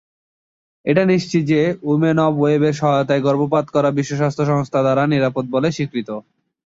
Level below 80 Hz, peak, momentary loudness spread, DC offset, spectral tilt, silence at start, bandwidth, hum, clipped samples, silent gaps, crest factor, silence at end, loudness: -58 dBFS; -2 dBFS; 6 LU; under 0.1%; -7 dB/octave; 0.85 s; 7.8 kHz; none; under 0.1%; none; 16 dB; 0.5 s; -18 LUFS